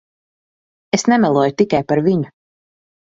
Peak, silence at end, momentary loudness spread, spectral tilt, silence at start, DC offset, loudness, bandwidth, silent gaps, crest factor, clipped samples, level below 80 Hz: 0 dBFS; 0.8 s; 7 LU; -5.5 dB/octave; 0.95 s; under 0.1%; -16 LUFS; 7.8 kHz; none; 18 dB; under 0.1%; -56 dBFS